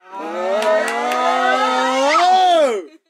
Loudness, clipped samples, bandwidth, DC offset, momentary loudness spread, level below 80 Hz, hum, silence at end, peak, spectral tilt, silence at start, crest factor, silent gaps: -16 LUFS; under 0.1%; 15.5 kHz; under 0.1%; 7 LU; -80 dBFS; none; 0.2 s; -4 dBFS; -1 dB/octave; 0.1 s; 12 dB; none